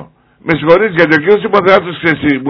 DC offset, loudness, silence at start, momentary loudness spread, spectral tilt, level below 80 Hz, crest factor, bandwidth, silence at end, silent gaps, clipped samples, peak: under 0.1%; -10 LUFS; 0 s; 6 LU; -7.5 dB/octave; -44 dBFS; 10 dB; 5.4 kHz; 0 s; none; 2%; 0 dBFS